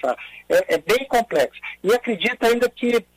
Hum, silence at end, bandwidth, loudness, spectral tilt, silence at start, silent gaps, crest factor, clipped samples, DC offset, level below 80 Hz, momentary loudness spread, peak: none; 0.15 s; 15.5 kHz; -21 LUFS; -3.5 dB/octave; 0.05 s; none; 14 dB; under 0.1%; under 0.1%; -54 dBFS; 6 LU; -6 dBFS